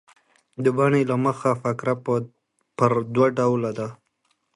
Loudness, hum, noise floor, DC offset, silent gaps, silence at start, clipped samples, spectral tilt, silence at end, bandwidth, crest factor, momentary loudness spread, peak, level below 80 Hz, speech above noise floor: -22 LUFS; none; -71 dBFS; under 0.1%; none; 0.6 s; under 0.1%; -8 dB/octave; 0.6 s; 11.5 kHz; 20 dB; 14 LU; -4 dBFS; -64 dBFS; 49 dB